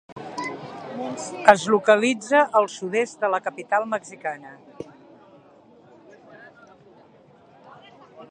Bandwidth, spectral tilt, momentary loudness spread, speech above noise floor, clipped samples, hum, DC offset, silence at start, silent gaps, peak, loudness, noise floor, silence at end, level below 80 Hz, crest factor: 10 kHz; -4 dB/octave; 20 LU; 31 dB; under 0.1%; none; under 0.1%; 0.1 s; 0.12-0.16 s; 0 dBFS; -22 LUFS; -53 dBFS; 0.05 s; -68 dBFS; 24 dB